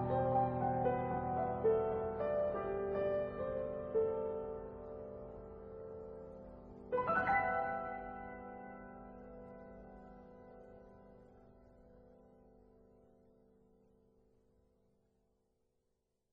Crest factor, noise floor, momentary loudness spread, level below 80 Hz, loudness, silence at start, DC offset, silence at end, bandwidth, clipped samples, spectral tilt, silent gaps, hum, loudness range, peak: 18 dB; -84 dBFS; 22 LU; -62 dBFS; -38 LUFS; 0 s; under 0.1%; 3.85 s; 4.9 kHz; under 0.1%; -6.5 dB/octave; none; none; 21 LU; -22 dBFS